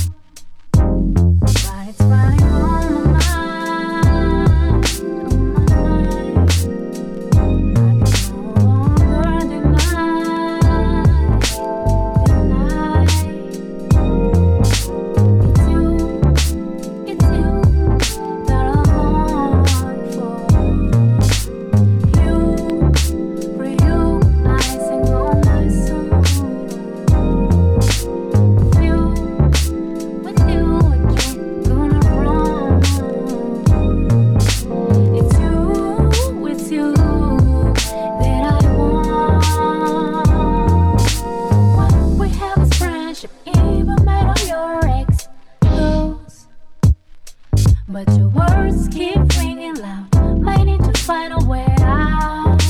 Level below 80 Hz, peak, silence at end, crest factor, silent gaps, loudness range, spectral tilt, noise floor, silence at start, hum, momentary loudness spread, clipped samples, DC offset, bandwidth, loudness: -18 dBFS; 0 dBFS; 0 s; 14 dB; none; 2 LU; -6.5 dB/octave; -36 dBFS; 0 s; none; 7 LU; under 0.1%; under 0.1%; 16 kHz; -16 LUFS